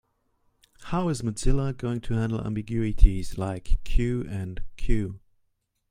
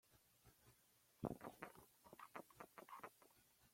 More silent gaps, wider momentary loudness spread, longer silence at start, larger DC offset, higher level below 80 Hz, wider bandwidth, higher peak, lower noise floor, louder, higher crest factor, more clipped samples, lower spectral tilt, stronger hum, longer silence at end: neither; about the same, 11 LU vs 12 LU; first, 0.8 s vs 0.05 s; neither; first, -28 dBFS vs -78 dBFS; second, 10.5 kHz vs 16.5 kHz; first, -2 dBFS vs -30 dBFS; second, -73 dBFS vs -77 dBFS; first, -29 LUFS vs -57 LUFS; second, 24 dB vs 30 dB; neither; about the same, -7 dB/octave vs -6 dB/octave; neither; first, 0.75 s vs 0 s